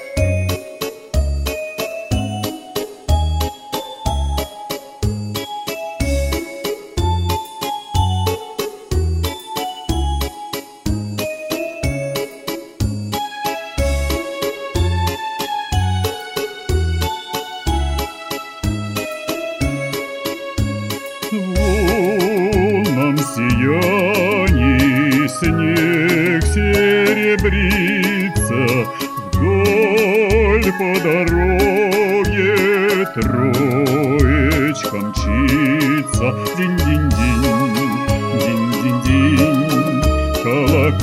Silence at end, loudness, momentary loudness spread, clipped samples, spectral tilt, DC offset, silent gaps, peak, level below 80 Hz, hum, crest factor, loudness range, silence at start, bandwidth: 0 s; -18 LUFS; 11 LU; under 0.1%; -5.5 dB/octave; under 0.1%; none; 0 dBFS; -26 dBFS; none; 16 dB; 8 LU; 0 s; 16 kHz